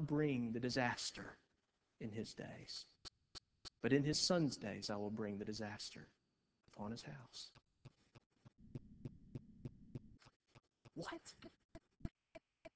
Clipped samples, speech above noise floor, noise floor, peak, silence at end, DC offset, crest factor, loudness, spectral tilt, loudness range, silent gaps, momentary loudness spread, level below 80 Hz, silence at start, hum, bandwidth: under 0.1%; 42 dB; -85 dBFS; -22 dBFS; 0.05 s; under 0.1%; 24 dB; -43 LUFS; -4.5 dB/octave; 15 LU; 8.26-8.30 s, 10.36-10.40 s, 11.65-11.69 s; 21 LU; -70 dBFS; 0 s; none; 8 kHz